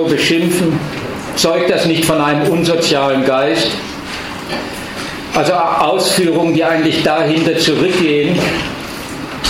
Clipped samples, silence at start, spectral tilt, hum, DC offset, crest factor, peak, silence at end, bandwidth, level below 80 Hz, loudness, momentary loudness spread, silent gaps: under 0.1%; 0 s; -4.5 dB/octave; none; under 0.1%; 12 dB; -2 dBFS; 0 s; 16.5 kHz; -42 dBFS; -14 LUFS; 11 LU; none